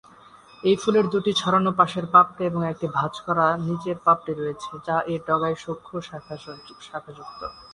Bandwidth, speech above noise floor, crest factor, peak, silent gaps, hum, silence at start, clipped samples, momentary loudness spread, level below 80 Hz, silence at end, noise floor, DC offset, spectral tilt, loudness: 11 kHz; 26 dB; 22 dB; -2 dBFS; none; none; 0.65 s; under 0.1%; 19 LU; -60 dBFS; 0.1 s; -50 dBFS; under 0.1%; -6 dB/octave; -22 LUFS